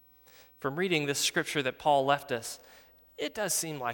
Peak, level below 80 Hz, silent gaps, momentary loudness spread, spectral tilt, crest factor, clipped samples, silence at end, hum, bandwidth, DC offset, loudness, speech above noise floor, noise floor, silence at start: -12 dBFS; -70 dBFS; none; 11 LU; -3 dB/octave; 20 dB; under 0.1%; 0 s; none; 19 kHz; under 0.1%; -30 LUFS; 28 dB; -58 dBFS; 0.4 s